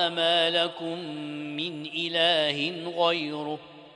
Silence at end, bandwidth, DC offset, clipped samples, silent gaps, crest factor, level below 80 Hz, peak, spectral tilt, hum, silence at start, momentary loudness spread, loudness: 0.05 s; 10.5 kHz; under 0.1%; under 0.1%; none; 18 dB; -76 dBFS; -10 dBFS; -4 dB/octave; none; 0 s; 13 LU; -26 LUFS